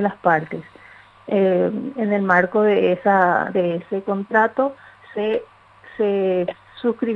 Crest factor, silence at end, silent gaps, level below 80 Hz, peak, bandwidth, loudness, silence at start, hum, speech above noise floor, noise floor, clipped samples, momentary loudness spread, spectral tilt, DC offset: 18 dB; 0 s; none; -66 dBFS; -2 dBFS; 6.6 kHz; -20 LUFS; 0 s; none; 28 dB; -47 dBFS; under 0.1%; 9 LU; -8.5 dB/octave; under 0.1%